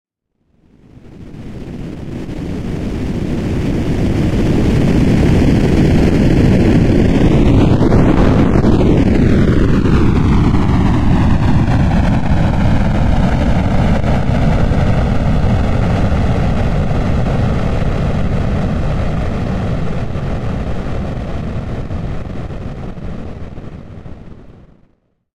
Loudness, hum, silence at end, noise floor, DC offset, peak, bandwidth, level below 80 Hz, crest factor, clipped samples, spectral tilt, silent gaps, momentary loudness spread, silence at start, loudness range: -14 LUFS; none; 0.85 s; -62 dBFS; under 0.1%; 0 dBFS; 11.5 kHz; -20 dBFS; 12 dB; under 0.1%; -8 dB/octave; none; 15 LU; 0.95 s; 13 LU